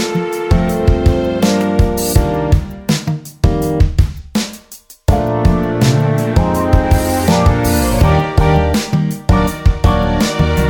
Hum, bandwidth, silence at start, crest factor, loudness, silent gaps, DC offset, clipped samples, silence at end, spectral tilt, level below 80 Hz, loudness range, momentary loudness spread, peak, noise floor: none; 20 kHz; 0 s; 12 dB; -14 LUFS; none; under 0.1%; under 0.1%; 0 s; -6 dB/octave; -18 dBFS; 3 LU; 5 LU; 0 dBFS; -39 dBFS